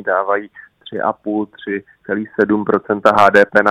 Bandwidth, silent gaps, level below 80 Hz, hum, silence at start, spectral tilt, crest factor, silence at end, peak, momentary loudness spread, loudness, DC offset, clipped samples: 12.5 kHz; none; -56 dBFS; none; 0 s; -6 dB/octave; 16 dB; 0 s; 0 dBFS; 15 LU; -16 LUFS; under 0.1%; 0.2%